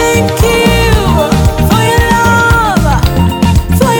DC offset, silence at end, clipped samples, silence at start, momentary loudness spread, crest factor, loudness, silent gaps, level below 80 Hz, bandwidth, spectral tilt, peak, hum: under 0.1%; 0 s; under 0.1%; 0 s; 2 LU; 8 dB; -9 LUFS; none; -16 dBFS; 19.5 kHz; -5.5 dB/octave; 0 dBFS; none